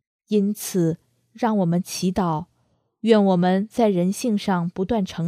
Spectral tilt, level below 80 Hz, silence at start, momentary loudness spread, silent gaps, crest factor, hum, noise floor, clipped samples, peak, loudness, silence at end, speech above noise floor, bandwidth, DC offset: -6.5 dB/octave; -54 dBFS; 0.3 s; 7 LU; none; 18 dB; none; -67 dBFS; under 0.1%; -2 dBFS; -22 LUFS; 0 s; 47 dB; 15.5 kHz; under 0.1%